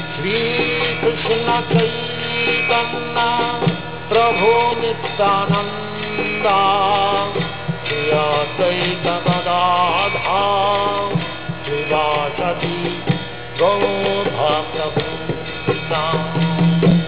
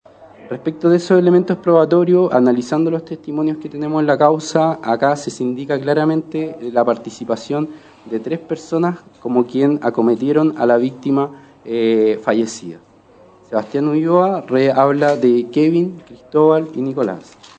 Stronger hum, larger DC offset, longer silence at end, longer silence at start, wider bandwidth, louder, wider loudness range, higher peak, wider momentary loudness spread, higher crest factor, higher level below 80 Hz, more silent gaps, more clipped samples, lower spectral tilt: first, 60 Hz at -40 dBFS vs none; first, 1% vs under 0.1%; second, 0 s vs 0.35 s; second, 0 s vs 0.2 s; second, 4 kHz vs 9 kHz; about the same, -18 LUFS vs -16 LUFS; about the same, 3 LU vs 5 LU; about the same, -2 dBFS vs 0 dBFS; second, 8 LU vs 11 LU; about the same, 16 dB vs 16 dB; first, -44 dBFS vs -64 dBFS; neither; neither; first, -9.5 dB/octave vs -7 dB/octave